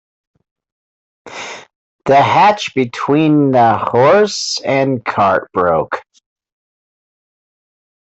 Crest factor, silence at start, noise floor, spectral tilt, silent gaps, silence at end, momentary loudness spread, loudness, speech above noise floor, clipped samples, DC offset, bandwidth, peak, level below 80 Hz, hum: 14 dB; 1.25 s; under -90 dBFS; -5 dB/octave; 1.75-1.99 s; 2.2 s; 17 LU; -13 LUFS; over 78 dB; under 0.1%; under 0.1%; 8.2 kHz; -2 dBFS; -56 dBFS; none